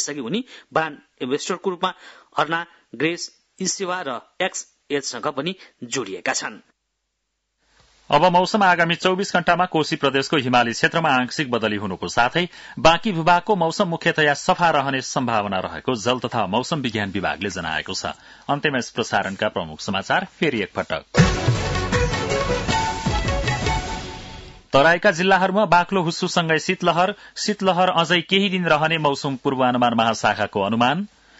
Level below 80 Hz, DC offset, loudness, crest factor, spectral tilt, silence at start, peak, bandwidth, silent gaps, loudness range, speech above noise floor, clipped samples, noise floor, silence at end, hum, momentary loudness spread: -40 dBFS; under 0.1%; -21 LUFS; 18 dB; -4.5 dB/octave; 0 s; -4 dBFS; 8 kHz; none; 7 LU; 55 dB; under 0.1%; -76 dBFS; 0.35 s; none; 10 LU